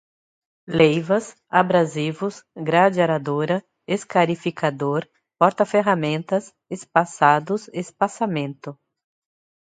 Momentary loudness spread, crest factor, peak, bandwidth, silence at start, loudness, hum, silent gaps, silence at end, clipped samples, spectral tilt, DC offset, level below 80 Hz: 11 LU; 22 dB; 0 dBFS; 9.4 kHz; 0.7 s; -21 LUFS; none; none; 1 s; under 0.1%; -6 dB/octave; under 0.1%; -66 dBFS